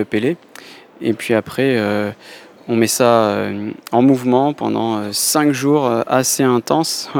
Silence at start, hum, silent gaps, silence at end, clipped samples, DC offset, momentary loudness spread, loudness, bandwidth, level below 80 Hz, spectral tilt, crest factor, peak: 0 s; none; none; 0 s; under 0.1%; under 0.1%; 10 LU; -16 LUFS; over 20 kHz; -60 dBFS; -4.5 dB/octave; 16 dB; 0 dBFS